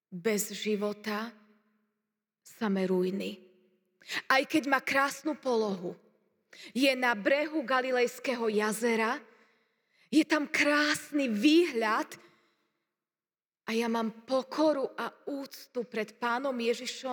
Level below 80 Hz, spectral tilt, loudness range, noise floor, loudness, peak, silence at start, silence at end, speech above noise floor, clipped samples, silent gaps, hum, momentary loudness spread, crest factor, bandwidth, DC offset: -90 dBFS; -4 dB/octave; 5 LU; under -90 dBFS; -30 LUFS; -10 dBFS; 0.1 s; 0 s; over 60 dB; under 0.1%; none; none; 13 LU; 20 dB; over 20 kHz; under 0.1%